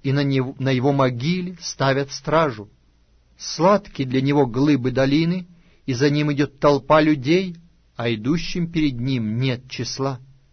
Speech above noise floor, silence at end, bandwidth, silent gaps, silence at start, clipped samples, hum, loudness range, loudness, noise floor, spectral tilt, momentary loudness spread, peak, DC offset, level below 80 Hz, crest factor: 37 dB; 0.3 s; 6.6 kHz; none; 0.05 s; under 0.1%; none; 3 LU; -21 LUFS; -57 dBFS; -6 dB/octave; 10 LU; -4 dBFS; under 0.1%; -44 dBFS; 18 dB